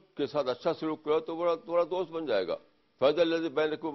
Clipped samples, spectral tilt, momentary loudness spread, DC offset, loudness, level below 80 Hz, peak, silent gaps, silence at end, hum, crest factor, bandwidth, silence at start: under 0.1%; -6.5 dB/octave; 6 LU; under 0.1%; -30 LUFS; -70 dBFS; -12 dBFS; none; 0 s; none; 18 dB; 6 kHz; 0.15 s